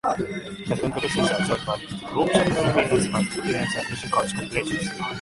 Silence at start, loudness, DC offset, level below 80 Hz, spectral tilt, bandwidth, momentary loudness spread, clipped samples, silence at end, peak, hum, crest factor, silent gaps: 0.05 s; -24 LUFS; under 0.1%; -48 dBFS; -4.5 dB/octave; 11.5 kHz; 9 LU; under 0.1%; 0 s; -4 dBFS; none; 20 dB; none